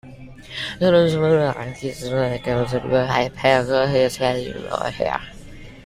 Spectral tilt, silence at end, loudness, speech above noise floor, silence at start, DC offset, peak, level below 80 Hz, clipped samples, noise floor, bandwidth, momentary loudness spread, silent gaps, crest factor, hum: -6 dB/octave; 0 s; -20 LUFS; 20 dB; 0.05 s; under 0.1%; -2 dBFS; -46 dBFS; under 0.1%; -39 dBFS; 15 kHz; 12 LU; none; 18 dB; none